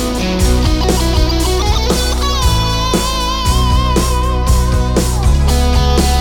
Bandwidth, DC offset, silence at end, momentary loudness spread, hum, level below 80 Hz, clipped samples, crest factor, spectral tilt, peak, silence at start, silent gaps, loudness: 18 kHz; under 0.1%; 0 s; 2 LU; none; -14 dBFS; under 0.1%; 12 dB; -4.5 dB/octave; 0 dBFS; 0 s; none; -14 LUFS